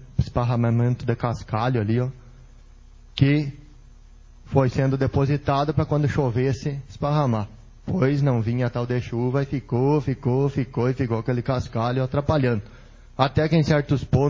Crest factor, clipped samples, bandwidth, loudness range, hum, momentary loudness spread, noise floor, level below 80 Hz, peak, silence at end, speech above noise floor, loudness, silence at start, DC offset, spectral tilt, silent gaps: 20 dB; under 0.1%; 7.4 kHz; 3 LU; none; 6 LU; -47 dBFS; -42 dBFS; -2 dBFS; 0 s; 25 dB; -23 LUFS; 0 s; under 0.1%; -8 dB/octave; none